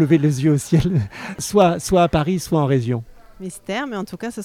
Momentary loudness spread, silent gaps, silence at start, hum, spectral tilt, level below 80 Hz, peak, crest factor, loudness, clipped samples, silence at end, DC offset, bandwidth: 13 LU; none; 0 s; none; -6.5 dB/octave; -40 dBFS; -2 dBFS; 16 dB; -19 LUFS; under 0.1%; 0 s; under 0.1%; 16 kHz